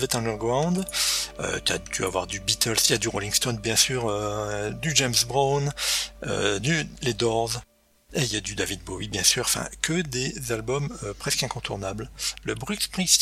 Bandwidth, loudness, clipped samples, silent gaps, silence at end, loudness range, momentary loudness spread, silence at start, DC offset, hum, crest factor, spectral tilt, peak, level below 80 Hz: 16 kHz; -25 LUFS; under 0.1%; none; 0 s; 4 LU; 9 LU; 0 s; under 0.1%; none; 26 dB; -2.5 dB/octave; 0 dBFS; -46 dBFS